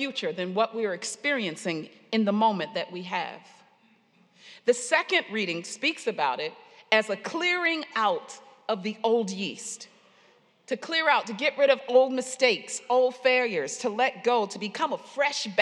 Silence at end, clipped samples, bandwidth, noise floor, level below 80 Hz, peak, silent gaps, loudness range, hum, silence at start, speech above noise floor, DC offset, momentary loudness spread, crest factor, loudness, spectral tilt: 0 s; under 0.1%; 11.5 kHz; -62 dBFS; under -90 dBFS; -4 dBFS; none; 5 LU; none; 0 s; 36 dB; under 0.1%; 10 LU; 22 dB; -26 LUFS; -3 dB/octave